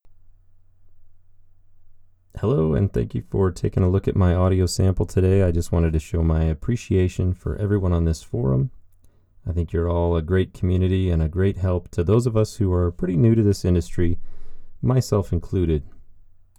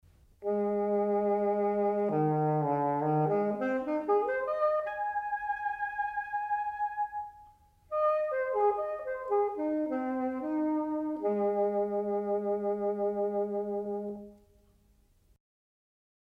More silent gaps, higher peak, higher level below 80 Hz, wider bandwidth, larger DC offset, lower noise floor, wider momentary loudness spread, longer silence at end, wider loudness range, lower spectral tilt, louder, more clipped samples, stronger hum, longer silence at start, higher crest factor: neither; first, -6 dBFS vs -18 dBFS; first, -34 dBFS vs -68 dBFS; first, 12.5 kHz vs 5 kHz; neither; second, -53 dBFS vs -65 dBFS; about the same, 6 LU vs 6 LU; second, 0.4 s vs 2.05 s; about the same, 4 LU vs 5 LU; second, -8 dB/octave vs -10 dB/octave; first, -22 LUFS vs -31 LUFS; neither; neither; second, 0.05 s vs 0.4 s; about the same, 16 dB vs 14 dB